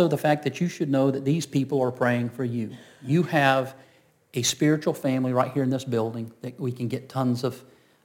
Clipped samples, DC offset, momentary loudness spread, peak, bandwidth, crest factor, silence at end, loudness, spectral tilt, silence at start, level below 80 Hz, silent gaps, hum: under 0.1%; under 0.1%; 11 LU; -6 dBFS; 17 kHz; 18 dB; 0.45 s; -25 LUFS; -5.5 dB/octave; 0 s; -72 dBFS; none; none